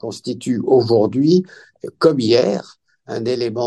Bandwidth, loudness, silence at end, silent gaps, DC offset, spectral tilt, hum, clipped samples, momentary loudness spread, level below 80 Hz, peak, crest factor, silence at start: 10.5 kHz; -17 LUFS; 0 s; none; under 0.1%; -6.5 dB/octave; none; under 0.1%; 16 LU; -62 dBFS; -2 dBFS; 16 dB; 0.05 s